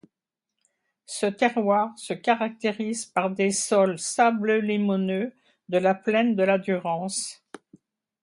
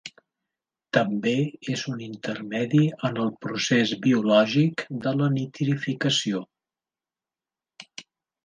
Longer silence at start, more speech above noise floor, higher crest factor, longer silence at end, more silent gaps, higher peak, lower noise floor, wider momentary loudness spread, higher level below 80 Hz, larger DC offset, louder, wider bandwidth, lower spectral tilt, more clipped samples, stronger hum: first, 1.1 s vs 0.05 s; second, 62 dB vs over 66 dB; about the same, 20 dB vs 22 dB; first, 0.9 s vs 0.45 s; neither; about the same, -6 dBFS vs -4 dBFS; second, -86 dBFS vs under -90 dBFS; second, 8 LU vs 13 LU; about the same, -74 dBFS vs -70 dBFS; neither; about the same, -24 LUFS vs -24 LUFS; first, 11.5 kHz vs 10 kHz; about the same, -4.5 dB/octave vs -5.5 dB/octave; neither; neither